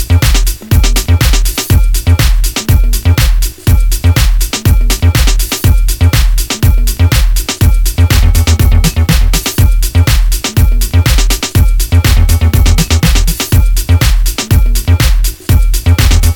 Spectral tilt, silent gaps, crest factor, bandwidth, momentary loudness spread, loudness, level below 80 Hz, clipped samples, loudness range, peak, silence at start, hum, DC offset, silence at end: -4.5 dB/octave; none; 8 dB; 19 kHz; 3 LU; -10 LUFS; -10 dBFS; 0.3%; 1 LU; 0 dBFS; 0 s; none; under 0.1%; 0 s